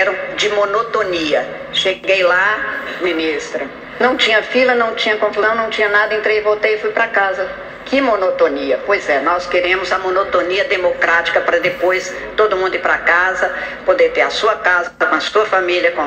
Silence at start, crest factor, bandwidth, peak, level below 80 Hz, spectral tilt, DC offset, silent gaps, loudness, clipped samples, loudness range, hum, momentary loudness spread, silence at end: 0 s; 14 dB; 9 kHz; 0 dBFS; -48 dBFS; -3 dB/octave; under 0.1%; none; -15 LUFS; under 0.1%; 2 LU; none; 6 LU; 0 s